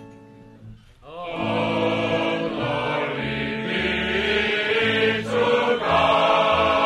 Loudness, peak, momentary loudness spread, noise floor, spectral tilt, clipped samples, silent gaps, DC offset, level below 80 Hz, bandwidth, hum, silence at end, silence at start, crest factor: -21 LUFS; -6 dBFS; 8 LU; -46 dBFS; -5.5 dB/octave; under 0.1%; none; under 0.1%; -46 dBFS; 11.5 kHz; none; 0 s; 0 s; 16 dB